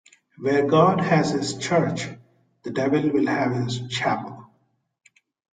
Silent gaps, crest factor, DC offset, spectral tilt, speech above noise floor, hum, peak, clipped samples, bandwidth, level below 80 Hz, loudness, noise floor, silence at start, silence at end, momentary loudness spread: none; 20 dB; under 0.1%; -6 dB/octave; 46 dB; none; -4 dBFS; under 0.1%; 9.4 kHz; -60 dBFS; -22 LUFS; -67 dBFS; 0.4 s; 1.05 s; 13 LU